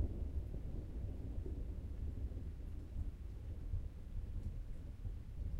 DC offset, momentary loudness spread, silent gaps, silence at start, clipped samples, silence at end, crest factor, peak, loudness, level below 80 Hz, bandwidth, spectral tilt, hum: under 0.1%; 4 LU; none; 0 s; under 0.1%; 0 s; 16 dB; -28 dBFS; -48 LUFS; -46 dBFS; 8.4 kHz; -9 dB/octave; none